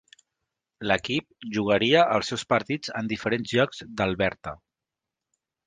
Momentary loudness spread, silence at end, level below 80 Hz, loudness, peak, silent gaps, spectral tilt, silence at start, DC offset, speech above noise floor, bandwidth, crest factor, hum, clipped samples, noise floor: 10 LU; 1.1 s; -56 dBFS; -25 LUFS; -6 dBFS; none; -5 dB/octave; 0.8 s; under 0.1%; 63 dB; 9.8 kHz; 22 dB; none; under 0.1%; -88 dBFS